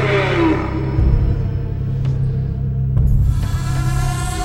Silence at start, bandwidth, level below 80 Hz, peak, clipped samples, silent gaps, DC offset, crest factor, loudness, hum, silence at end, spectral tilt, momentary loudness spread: 0 s; 13.5 kHz; -22 dBFS; -2 dBFS; under 0.1%; none; under 0.1%; 14 dB; -18 LUFS; none; 0 s; -7 dB/octave; 5 LU